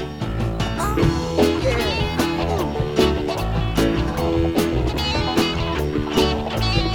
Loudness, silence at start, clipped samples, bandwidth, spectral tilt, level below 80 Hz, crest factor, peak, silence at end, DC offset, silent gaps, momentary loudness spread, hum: -21 LUFS; 0 s; under 0.1%; 19 kHz; -5.5 dB/octave; -28 dBFS; 16 dB; -4 dBFS; 0 s; under 0.1%; none; 4 LU; none